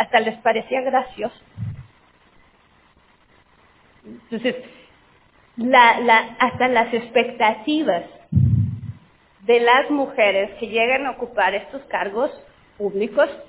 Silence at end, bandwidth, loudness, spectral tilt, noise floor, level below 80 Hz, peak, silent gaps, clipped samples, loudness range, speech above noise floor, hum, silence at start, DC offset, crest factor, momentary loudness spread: 0.05 s; 4 kHz; -19 LUFS; -9 dB/octave; -56 dBFS; -44 dBFS; 0 dBFS; none; under 0.1%; 16 LU; 37 dB; none; 0 s; under 0.1%; 20 dB; 16 LU